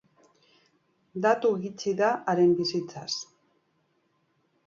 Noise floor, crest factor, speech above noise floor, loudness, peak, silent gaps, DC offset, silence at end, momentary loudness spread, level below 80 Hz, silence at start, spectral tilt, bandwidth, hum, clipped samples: -71 dBFS; 20 dB; 46 dB; -27 LUFS; -10 dBFS; none; under 0.1%; 1.45 s; 11 LU; -74 dBFS; 1.15 s; -5 dB/octave; 7.6 kHz; none; under 0.1%